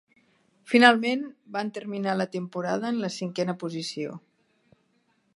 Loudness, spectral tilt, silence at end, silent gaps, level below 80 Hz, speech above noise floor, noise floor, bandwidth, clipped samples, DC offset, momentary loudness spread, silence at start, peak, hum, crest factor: -26 LUFS; -5 dB/octave; 1.2 s; none; -78 dBFS; 43 dB; -69 dBFS; 11.5 kHz; under 0.1%; under 0.1%; 15 LU; 0.65 s; 0 dBFS; none; 26 dB